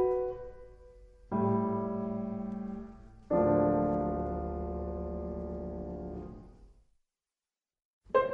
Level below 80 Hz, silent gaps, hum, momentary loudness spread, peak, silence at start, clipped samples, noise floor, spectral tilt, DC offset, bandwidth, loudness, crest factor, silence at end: -48 dBFS; 7.85-8.01 s; none; 17 LU; -14 dBFS; 0 s; under 0.1%; under -90 dBFS; -10.5 dB/octave; under 0.1%; 4.8 kHz; -33 LUFS; 20 dB; 0 s